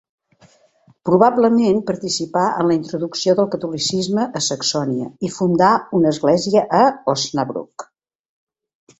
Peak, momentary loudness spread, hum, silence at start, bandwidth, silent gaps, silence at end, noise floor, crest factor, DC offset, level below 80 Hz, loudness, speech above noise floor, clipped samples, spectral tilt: -2 dBFS; 10 LU; none; 1.05 s; 8.2 kHz; none; 1.15 s; -55 dBFS; 16 dB; under 0.1%; -60 dBFS; -18 LUFS; 38 dB; under 0.1%; -5 dB/octave